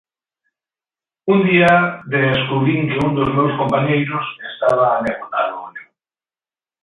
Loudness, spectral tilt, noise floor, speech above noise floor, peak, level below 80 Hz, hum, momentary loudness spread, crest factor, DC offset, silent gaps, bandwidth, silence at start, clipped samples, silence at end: -17 LUFS; -8 dB/octave; under -90 dBFS; over 74 dB; 0 dBFS; -52 dBFS; none; 11 LU; 18 dB; under 0.1%; none; 11 kHz; 1.25 s; under 0.1%; 1 s